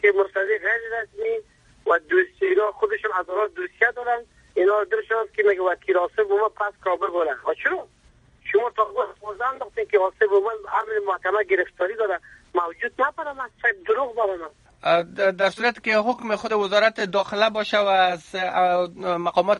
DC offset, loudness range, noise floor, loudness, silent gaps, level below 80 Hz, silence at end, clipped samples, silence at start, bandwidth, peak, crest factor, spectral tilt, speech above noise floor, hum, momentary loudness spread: under 0.1%; 3 LU; -56 dBFS; -23 LUFS; none; -62 dBFS; 0 s; under 0.1%; 0.05 s; 10 kHz; -4 dBFS; 18 dB; -4.5 dB/octave; 34 dB; none; 8 LU